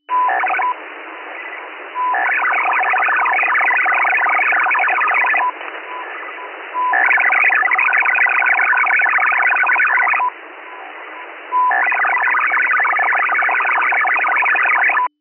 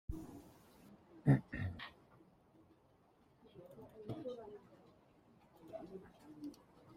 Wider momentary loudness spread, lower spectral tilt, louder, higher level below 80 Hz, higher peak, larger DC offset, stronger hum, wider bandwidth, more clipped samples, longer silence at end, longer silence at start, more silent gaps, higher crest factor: second, 16 LU vs 28 LU; second, -1 dB/octave vs -8.5 dB/octave; first, -14 LUFS vs -42 LUFS; second, under -90 dBFS vs -64 dBFS; first, -6 dBFS vs -18 dBFS; neither; neither; second, 3.2 kHz vs 11 kHz; neither; first, 0.15 s vs 0 s; about the same, 0.1 s vs 0.1 s; neither; second, 10 dB vs 26 dB